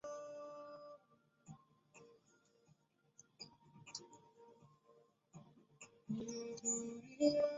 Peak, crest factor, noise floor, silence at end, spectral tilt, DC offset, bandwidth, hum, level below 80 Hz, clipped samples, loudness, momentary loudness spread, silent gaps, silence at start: -22 dBFS; 26 dB; -75 dBFS; 0 s; -5 dB/octave; under 0.1%; 7.6 kHz; none; -84 dBFS; under 0.1%; -43 LUFS; 26 LU; none; 0.05 s